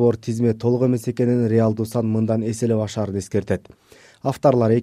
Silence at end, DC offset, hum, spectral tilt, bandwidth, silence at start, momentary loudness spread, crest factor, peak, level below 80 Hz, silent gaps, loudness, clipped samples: 0 s; under 0.1%; none; -8 dB/octave; 14 kHz; 0 s; 8 LU; 16 dB; -2 dBFS; -54 dBFS; none; -21 LUFS; under 0.1%